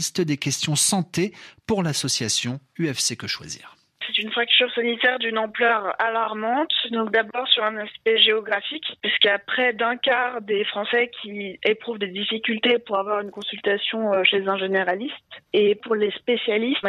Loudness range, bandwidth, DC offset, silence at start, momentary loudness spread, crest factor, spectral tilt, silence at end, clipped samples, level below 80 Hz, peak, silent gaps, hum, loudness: 3 LU; 14.5 kHz; under 0.1%; 0 s; 10 LU; 20 dB; -2.5 dB/octave; 0 s; under 0.1%; -66 dBFS; -2 dBFS; none; none; -22 LUFS